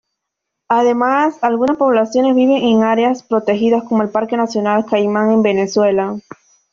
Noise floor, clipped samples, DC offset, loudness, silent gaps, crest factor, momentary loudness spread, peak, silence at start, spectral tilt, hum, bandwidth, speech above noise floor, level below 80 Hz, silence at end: -78 dBFS; under 0.1%; under 0.1%; -15 LUFS; none; 12 dB; 5 LU; -2 dBFS; 0.7 s; -6 dB/octave; none; 7.4 kHz; 64 dB; -58 dBFS; 0.5 s